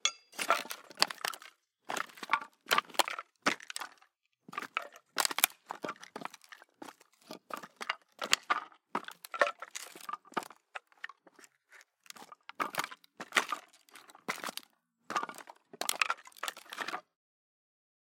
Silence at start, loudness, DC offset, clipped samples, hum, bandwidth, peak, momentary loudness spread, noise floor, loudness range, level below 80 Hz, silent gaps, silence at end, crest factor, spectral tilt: 0.05 s; -35 LUFS; under 0.1%; under 0.1%; none; 17 kHz; -2 dBFS; 20 LU; -70 dBFS; 6 LU; under -90 dBFS; none; 1.15 s; 36 dB; 0 dB/octave